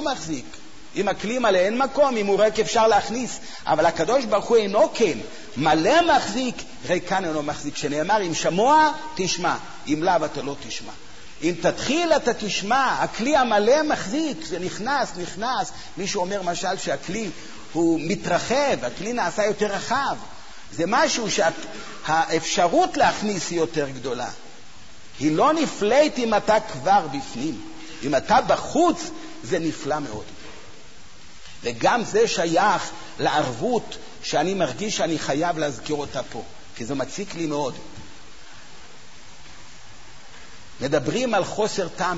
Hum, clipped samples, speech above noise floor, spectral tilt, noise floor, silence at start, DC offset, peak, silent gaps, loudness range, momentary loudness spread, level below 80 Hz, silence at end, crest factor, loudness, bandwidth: none; under 0.1%; 25 dB; -4 dB/octave; -47 dBFS; 0 s; 1%; -6 dBFS; none; 7 LU; 14 LU; -52 dBFS; 0 s; 16 dB; -22 LUFS; 8 kHz